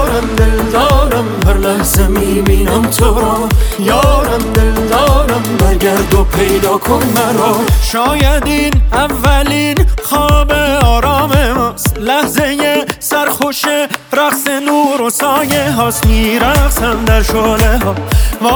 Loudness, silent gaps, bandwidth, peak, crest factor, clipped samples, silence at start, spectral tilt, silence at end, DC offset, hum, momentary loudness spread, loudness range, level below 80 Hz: -11 LUFS; none; over 20 kHz; 0 dBFS; 10 dB; under 0.1%; 0 s; -5 dB/octave; 0 s; under 0.1%; none; 3 LU; 1 LU; -16 dBFS